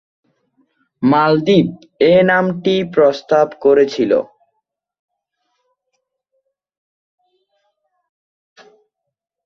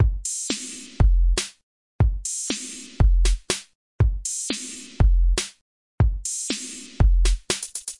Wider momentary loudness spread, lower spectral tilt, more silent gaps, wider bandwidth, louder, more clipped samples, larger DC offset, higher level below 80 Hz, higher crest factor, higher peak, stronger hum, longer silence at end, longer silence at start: second, 6 LU vs 9 LU; first, -7 dB/octave vs -4 dB/octave; second, none vs 1.63-1.99 s, 3.75-3.99 s, 5.61-5.98 s; second, 7 kHz vs 11.5 kHz; first, -14 LUFS vs -24 LUFS; neither; neither; second, -58 dBFS vs -24 dBFS; about the same, 18 dB vs 16 dB; first, 0 dBFS vs -6 dBFS; neither; first, 5.2 s vs 0.05 s; first, 1 s vs 0 s